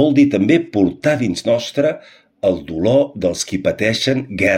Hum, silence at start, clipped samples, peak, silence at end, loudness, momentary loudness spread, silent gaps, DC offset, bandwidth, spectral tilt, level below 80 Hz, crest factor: none; 0 s; under 0.1%; -2 dBFS; 0 s; -17 LUFS; 6 LU; none; under 0.1%; 14.5 kHz; -5.5 dB/octave; -48 dBFS; 14 dB